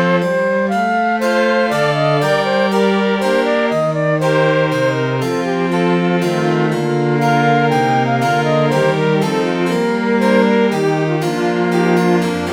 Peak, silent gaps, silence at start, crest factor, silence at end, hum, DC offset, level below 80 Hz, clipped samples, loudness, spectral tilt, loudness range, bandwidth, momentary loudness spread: 0 dBFS; none; 0 s; 14 dB; 0 s; none; under 0.1%; -54 dBFS; under 0.1%; -15 LUFS; -6.5 dB/octave; 1 LU; 17 kHz; 3 LU